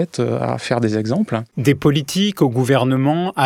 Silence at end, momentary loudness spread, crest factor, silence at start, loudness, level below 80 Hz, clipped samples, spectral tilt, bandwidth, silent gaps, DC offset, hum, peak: 0 s; 5 LU; 16 dB; 0 s; -18 LUFS; -54 dBFS; under 0.1%; -6 dB/octave; 16.5 kHz; none; under 0.1%; none; -2 dBFS